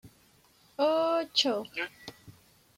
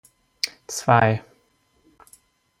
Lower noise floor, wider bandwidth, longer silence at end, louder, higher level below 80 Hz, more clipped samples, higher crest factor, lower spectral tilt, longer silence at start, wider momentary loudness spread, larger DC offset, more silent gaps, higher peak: about the same, -63 dBFS vs -64 dBFS; about the same, 16 kHz vs 16 kHz; second, 0.45 s vs 1.4 s; second, -29 LUFS vs -22 LUFS; second, -74 dBFS vs -60 dBFS; neither; about the same, 20 dB vs 22 dB; second, -2.5 dB/octave vs -4.5 dB/octave; second, 0.05 s vs 0.45 s; first, 21 LU vs 11 LU; neither; neither; second, -12 dBFS vs -2 dBFS